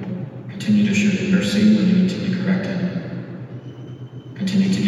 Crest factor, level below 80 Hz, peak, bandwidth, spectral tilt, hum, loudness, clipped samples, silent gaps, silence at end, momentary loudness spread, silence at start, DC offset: 14 dB; -64 dBFS; -4 dBFS; 11 kHz; -6.5 dB/octave; none; -19 LUFS; under 0.1%; none; 0 s; 19 LU; 0 s; under 0.1%